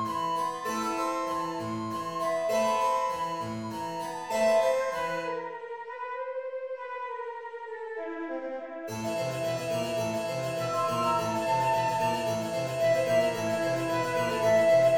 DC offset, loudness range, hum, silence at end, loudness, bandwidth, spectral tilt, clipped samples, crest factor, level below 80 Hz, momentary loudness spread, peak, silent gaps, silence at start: under 0.1%; 8 LU; none; 0 s; -29 LUFS; 18 kHz; -4.5 dB/octave; under 0.1%; 16 dB; -66 dBFS; 12 LU; -14 dBFS; none; 0 s